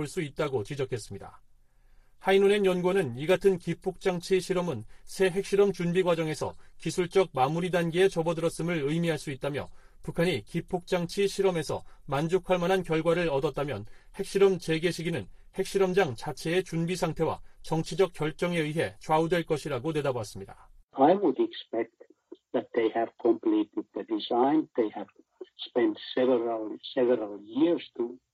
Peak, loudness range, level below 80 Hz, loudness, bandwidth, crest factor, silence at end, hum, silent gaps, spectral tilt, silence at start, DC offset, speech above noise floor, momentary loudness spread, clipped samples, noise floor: -10 dBFS; 3 LU; -54 dBFS; -28 LUFS; 14.5 kHz; 18 dB; 0.15 s; none; 20.83-20.88 s; -6 dB/octave; 0 s; under 0.1%; 30 dB; 11 LU; under 0.1%; -58 dBFS